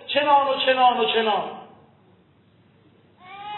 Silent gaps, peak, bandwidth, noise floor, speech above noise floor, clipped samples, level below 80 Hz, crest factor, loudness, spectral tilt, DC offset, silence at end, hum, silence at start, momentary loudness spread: none; -6 dBFS; 4.2 kHz; -57 dBFS; 38 dB; under 0.1%; -76 dBFS; 18 dB; -19 LUFS; -7.5 dB/octave; under 0.1%; 0 s; none; 0.05 s; 19 LU